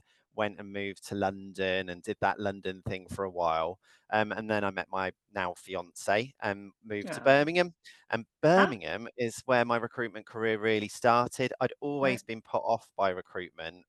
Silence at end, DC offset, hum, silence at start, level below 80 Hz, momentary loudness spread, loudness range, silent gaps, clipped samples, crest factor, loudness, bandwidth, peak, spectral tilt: 0.1 s; under 0.1%; none; 0.35 s; -66 dBFS; 13 LU; 5 LU; none; under 0.1%; 22 dB; -31 LUFS; 12.5 kHz; -8 dBFS; -5 dB/octave